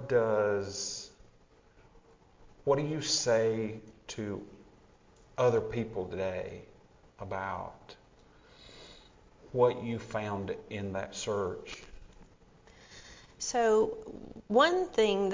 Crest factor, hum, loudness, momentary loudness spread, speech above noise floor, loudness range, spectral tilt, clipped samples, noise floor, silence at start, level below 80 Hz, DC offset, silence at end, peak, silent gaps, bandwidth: 20 dB; none; -31 LUFS; 24 LU; 31 dB; 8 LU; -4 dB/octave; under 0.1%; -61 dBFS; 0 s; -60 dBFS; under 0.1%; 0 s; -12 dBFS; none; 7.6 kHz